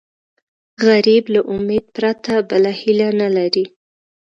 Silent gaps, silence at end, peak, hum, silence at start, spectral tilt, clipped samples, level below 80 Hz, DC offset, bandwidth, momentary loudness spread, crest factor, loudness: none; 0.7 s; 0 dBFS; none; 0.8 s; -6 dB/octave; under 0.1%; -56 dBFS; under 0.1%; 7.4 kHz; 7 LU; 16 dB; -16 LUFS